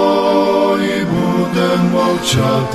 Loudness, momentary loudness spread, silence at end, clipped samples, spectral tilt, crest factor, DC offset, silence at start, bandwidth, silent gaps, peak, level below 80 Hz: -14 LUFS; 3 LU; 0 s; under 0.1%; -5.5 dB/octave; 12 dB; 0.3%; 0 s; 13.5 kHz; none; -2 dBFS; -44 dBFS